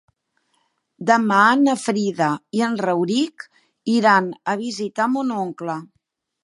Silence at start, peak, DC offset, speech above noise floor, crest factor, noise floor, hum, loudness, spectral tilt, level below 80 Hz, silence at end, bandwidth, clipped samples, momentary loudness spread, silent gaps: 1 s; -2 dBFS; under 0.1%; 52 dB; 18 dB; -71 dBFS; none; -20 LUFS; -5 dB/octave; -74 dBFS; 0.6 s; 11.5 kHz; under 0.1%; 14 LU; none